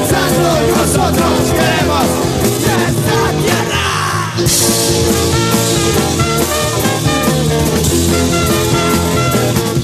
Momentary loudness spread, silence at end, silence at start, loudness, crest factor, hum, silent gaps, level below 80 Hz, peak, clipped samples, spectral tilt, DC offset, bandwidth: 2 LU; 0 s; 0 s; -12 LUFS; 12 dB; none; none; -28 dBFS; 0 dBFS; under 0.1%; -4 dB/octave; under 0.1%; 14.5 kHz